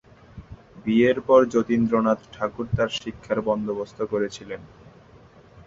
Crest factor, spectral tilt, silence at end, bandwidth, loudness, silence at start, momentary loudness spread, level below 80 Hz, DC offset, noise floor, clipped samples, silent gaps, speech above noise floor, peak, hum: 20 dB; -6.5 dB/octave; 0.05 s; 7.8 kHz; -23 LUFS; 0.35 s; 15 LU; -50 dBFS; under 0.1%; -50 dBFS; under 0.1%; none; 28 dB; -4 dBFS; none